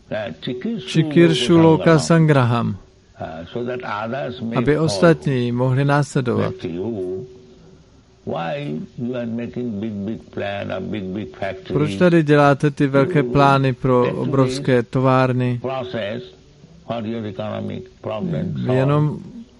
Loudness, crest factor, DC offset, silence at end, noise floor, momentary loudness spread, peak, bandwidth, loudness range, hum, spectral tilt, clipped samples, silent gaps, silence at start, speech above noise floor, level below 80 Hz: -19 LUFS; 18 dB; under 0.1%; 0.15 s; -49 dBFS; 14 LU; -2 dBFS; 11.5 kHz; 10 LU; none; -7 dB/octave; under 0.1%; none; 0.1 s; 31 dB; -50 dBFS